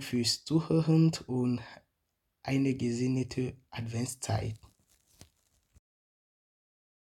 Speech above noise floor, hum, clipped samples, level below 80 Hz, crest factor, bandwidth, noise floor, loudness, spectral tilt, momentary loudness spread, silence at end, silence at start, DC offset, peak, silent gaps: 51 dB; none; under 0.1%; -62 dBFS; 18 dB; 14 kHz; -81 dBFS; -31 LUFS; -5.5 dB/octave; 14 LU; 2.45 s; 0 s; under 0.1%; -14 dBFS; none